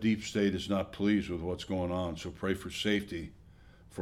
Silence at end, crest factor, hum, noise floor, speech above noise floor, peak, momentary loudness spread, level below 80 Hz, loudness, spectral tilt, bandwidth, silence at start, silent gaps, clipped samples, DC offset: 0 s; 16 dB; none; -56 dBFS; 24 dB; -16 dBFS; 10 LU; -54 dBFS; -33 LUFS; -5.5 dB/octave; 14 kHz; 0 s; none; under 0.1%; under 0.1%